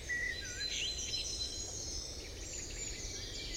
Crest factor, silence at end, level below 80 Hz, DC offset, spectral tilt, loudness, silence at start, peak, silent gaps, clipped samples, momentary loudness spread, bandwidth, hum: 16 dB; 0 s; -50 dBFS; under 0.1%; -1 dB/octave; -39 LUFS; 0 s; -26 dBFS; none; under 0.1%; 7 LU; 16 kHz; none